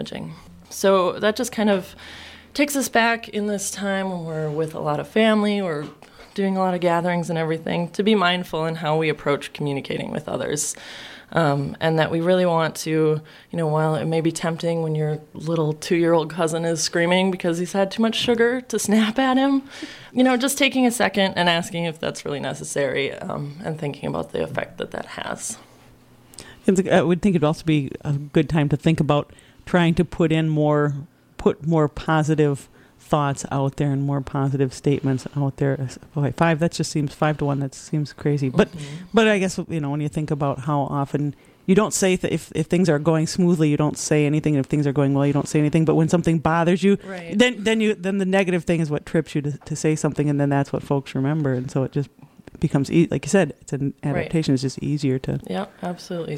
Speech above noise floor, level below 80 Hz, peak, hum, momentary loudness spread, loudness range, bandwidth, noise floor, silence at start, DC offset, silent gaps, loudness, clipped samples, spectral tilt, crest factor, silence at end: 29 dB; -50 dBFS; -4 dBFS; none; 10 LU; 4 LU; 16 kHz; -50 dBFS; 0 s; under 0.1%; none; -22 LUFS; under 0.1%; -5.5 dB/octave; 18 dB; 0 s